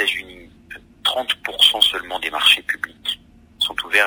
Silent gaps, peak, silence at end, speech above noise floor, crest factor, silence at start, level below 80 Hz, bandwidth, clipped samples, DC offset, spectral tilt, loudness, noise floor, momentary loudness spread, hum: none; 0 dBFS; 0 s; 24 dB; 20 dB; 0 s; -54 dBFS; 16 kHz; under 0.1%; under 0.1%; 0.5 dB/octave; -18 LUFS; -42 dBFS; 13 LU; none